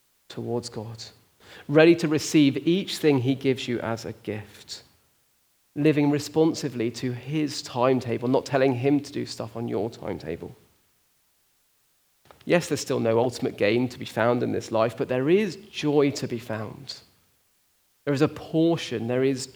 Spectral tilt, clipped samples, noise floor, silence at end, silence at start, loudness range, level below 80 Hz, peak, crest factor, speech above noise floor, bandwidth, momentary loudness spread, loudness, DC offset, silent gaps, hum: -6 dB/octave; under 0.1%; -66 dBFS; 0.05 s; 0.3 s; 6 LU; -66 dBFS; -2 dBFS; 22 dB; 42 dB; over 20 kHz; 16 LU; -25 LUFS; under 0.1%; none; none